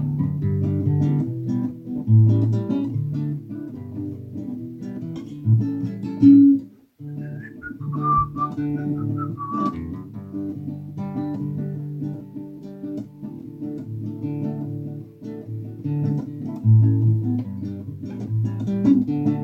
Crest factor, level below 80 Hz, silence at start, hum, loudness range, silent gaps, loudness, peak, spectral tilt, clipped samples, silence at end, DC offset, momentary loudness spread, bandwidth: 20 dB; -54 dBFS; 0 s; none; 11 LU; none; -23 LUFS; -4 dBFS; -11 dB/octave; under 0.1%; 0 s; under 0.1%; 17 LU; 4.2 kHz